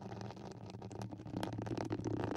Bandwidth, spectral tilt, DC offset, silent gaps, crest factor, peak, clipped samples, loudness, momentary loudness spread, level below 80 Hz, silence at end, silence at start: 12.5 kHz; -7 dB/octave; under 0.1%; none; 22 dB; -22 dBFS; under 0.1%; -44 LUFS; 10 LU; -64 dBFS; 0 s; 0 s